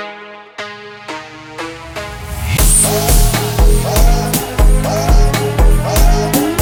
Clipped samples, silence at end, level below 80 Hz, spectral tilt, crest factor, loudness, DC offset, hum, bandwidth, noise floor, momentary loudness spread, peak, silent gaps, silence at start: under 0.1%; 0 s; -14 dBFS; -4 dB/octave; 12 dB; -13 LUFS; under 0.1%; none; over 20 kHz; -32 dBFS; 17 LU; 0 dBFS; none; 0 s